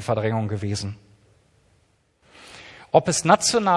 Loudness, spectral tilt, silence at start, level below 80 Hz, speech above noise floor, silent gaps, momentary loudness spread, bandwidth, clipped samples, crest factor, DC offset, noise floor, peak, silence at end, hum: -21 LUFS; -4 dB/octave; 0 s; -58 dBFS; 43 dB; none; 25 LU; 12 kHz; under 0.1%; 22 dB; under 0.1%; -63 dBFS; -2 dBFS; 0 s; none